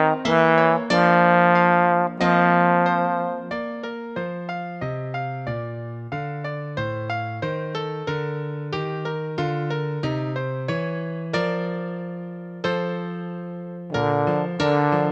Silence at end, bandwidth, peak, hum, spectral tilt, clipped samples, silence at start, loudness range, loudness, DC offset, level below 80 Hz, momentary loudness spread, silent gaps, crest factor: 0 s; 8.2 kHz; -2 dBFS; none; -7 dB/octave; under 0.1%; 0 s; 11 LU; -23 LUFS; under 0.1%; -58 dBFS; 14 LU; none; 20 dB